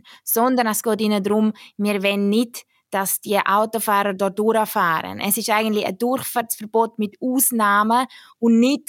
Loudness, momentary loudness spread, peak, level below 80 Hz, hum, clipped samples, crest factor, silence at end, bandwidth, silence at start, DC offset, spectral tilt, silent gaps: -20 LUFS; 7 LU; -2 dBFS; -76 dBFS; none; under 0.1%; 18 dB; 0.1 s; 17 kHz; 0.25 s; under 0.1%; -4 dB/octave; none